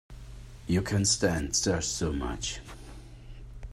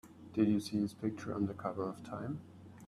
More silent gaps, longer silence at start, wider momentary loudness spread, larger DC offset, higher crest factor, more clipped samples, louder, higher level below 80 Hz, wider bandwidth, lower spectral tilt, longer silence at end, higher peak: neither; about the same, 0.1 s vs 0.05 s; first, 23 LU vs 12 LU; neither; about the same, 20 dB vs 18 dB; neither; first, -28 LUFS vs -37 LUFS; first, -44 dBFS vs -72 dBFS; about the same, 14 kHz vs 13.5 kHz; second, -3.5 dB/octave vs -7 dB/octave; about the same, 0 s vs 0 s; first, -12 dBFS vs -18 dBFS